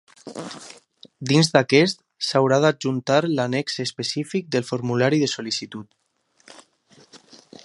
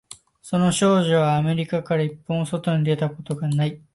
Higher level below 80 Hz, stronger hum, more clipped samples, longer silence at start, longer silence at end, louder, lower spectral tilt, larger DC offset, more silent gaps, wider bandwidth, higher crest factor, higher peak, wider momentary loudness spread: second, -68 dBFS vs -58 dBFS; neither; neither; first, 0.25 s vs 0.1 s; first, 0.45 s vs 0.15 s; about the same, -21 LUFS vs -22 LUFS; about the same, -5 dB/octave vs -6 dB/octave; neither; neither; about the same, 11.5 kHz vs 11.5 kHz; first, 22 dB vs 14 dB; first, 0 dBFS vs -8 dBFS; first, 19 LU vs 9 LU